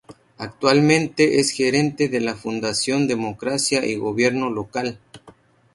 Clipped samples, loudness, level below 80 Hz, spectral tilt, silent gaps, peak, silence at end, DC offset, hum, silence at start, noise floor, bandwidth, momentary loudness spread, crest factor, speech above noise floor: under 0.1%; -20 LUFS; -58 dBFS; -4 dB/octave; none; 0 dBFS; 0.45 s; under 0.1%; none; 0.1 s; -51 dBFS; 11.5 kHz; 9 LU; 20 dB; 31 dB